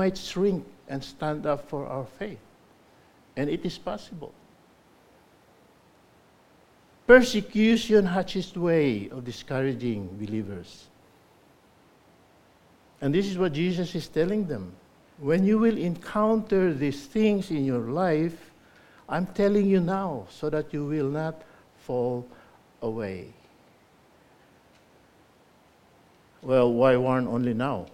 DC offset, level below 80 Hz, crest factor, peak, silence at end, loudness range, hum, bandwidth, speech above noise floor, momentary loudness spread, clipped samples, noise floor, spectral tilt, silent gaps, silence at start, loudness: under 0.1%; -54 dBFS; 24 dB; -4 dBFS; 0.05 s; 14 LU; none; 15 kHz; 34 dB; 16 LU; under 0.1%; -59 dBFS; -6.5 dB/octave; none; 0 s; -26 LUFS